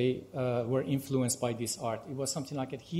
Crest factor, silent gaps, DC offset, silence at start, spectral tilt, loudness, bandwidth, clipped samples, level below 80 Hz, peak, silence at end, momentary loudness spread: 16 dB; none; under 0.1%; 0 s; -5 dB/octave; -33 LUFS; 16 kHz; under 0.1%; -66 dBFS; -16 dBFS; 0 s; 5 LU